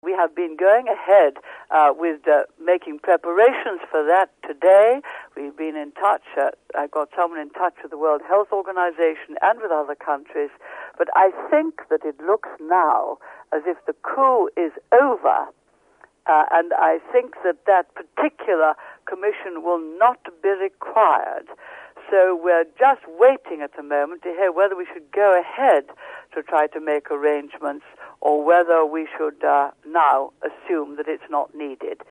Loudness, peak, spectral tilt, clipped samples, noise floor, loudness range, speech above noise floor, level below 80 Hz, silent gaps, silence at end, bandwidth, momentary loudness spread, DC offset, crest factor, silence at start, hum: -20 LUFS; -4 dBFS; -4.5 dB/octave; under 0.1%; -55 dBFS; 4 LU; 35 dB; -74 dBFS; none; 0.15 s; 10.5 kHz; 14 LU; under 0.1%; 16 dB; 0.05 s; none